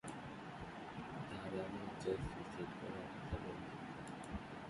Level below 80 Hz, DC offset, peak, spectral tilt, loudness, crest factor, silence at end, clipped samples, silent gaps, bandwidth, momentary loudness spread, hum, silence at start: -60 dBFS; under 0.1%; -28 dBFS; -6 dB/octave; -47 LUFS; 20 dB; 0 s; under 0.1%; none; 11.5 kHz; 7 LU; none; 0.05 s